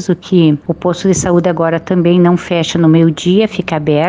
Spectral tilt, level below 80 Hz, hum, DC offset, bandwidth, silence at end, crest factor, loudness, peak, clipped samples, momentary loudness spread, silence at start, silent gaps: -6.5 dB/octave; -42 dBFS; none; under 0.1%; 9.6 kHz; 0 s; 12 dB; -12 LUFS; 0 dBFS; under 0.1%; 6 LU; 0 s; none